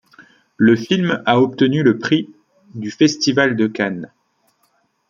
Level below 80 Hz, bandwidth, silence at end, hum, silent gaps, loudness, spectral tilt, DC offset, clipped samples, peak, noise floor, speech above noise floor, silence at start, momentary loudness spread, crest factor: -60 dBFS; 7.4 kHz; 1.05 s; none; none; -16 LUFS; -5.5 dB/octave; under 0.1%; under 0.1%; -2 dBFS; -63 dBFS; 47 dB; 0.2 s; 15 LU; 16 dB